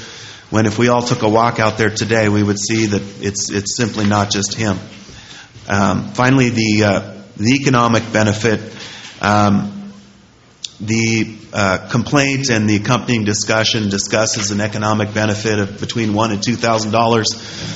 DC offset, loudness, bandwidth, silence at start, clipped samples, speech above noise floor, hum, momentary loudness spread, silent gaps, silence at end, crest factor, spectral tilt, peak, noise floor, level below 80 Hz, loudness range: under 0.1%; -16 LUFS; 8.2 kHz; 0 s; under 0.1%; 31 dB; none; 14 LU; none; 0 s; 16 dB; -4.5 dB/octave; 0 dBFS; -46 dBFS; -48 dBFS; 3 LU